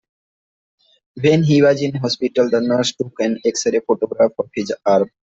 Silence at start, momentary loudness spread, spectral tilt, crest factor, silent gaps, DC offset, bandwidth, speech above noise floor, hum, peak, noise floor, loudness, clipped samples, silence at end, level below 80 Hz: 1.15 s; 8 LU; -5.5 dB/octave; 16 dB; none; under 0.1%; 8 kHz; over 73 dB; none; -2 dBFS; under -90 dBFS; -17 LUFS; under 0.1%; 0.3 s; -58 dBFS